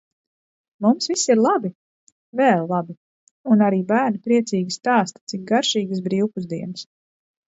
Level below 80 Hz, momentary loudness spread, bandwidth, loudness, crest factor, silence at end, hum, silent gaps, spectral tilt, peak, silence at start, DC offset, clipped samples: -70 dBFS; 14 LU; 8 kHz; -20 LUFS; 18 dB; 0.65 s; none; 1.75-2.33 s, 2.97-3.44 s, 5.21-5.27 s; -4.5 dB/octave; -4 dBFS; 0.8 s; under 0.1%; under 0.1%